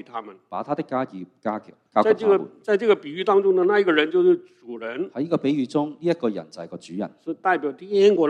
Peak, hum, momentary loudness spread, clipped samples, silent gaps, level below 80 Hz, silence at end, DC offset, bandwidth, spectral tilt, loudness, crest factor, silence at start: -4 dBFS; none; 16 LU; under 0.1%; none; -74 dBFS; 0 s; under 0.1%; 9 kHz; -6.5 dB/octave; -22 LUFS; 20 dB; 0.15 s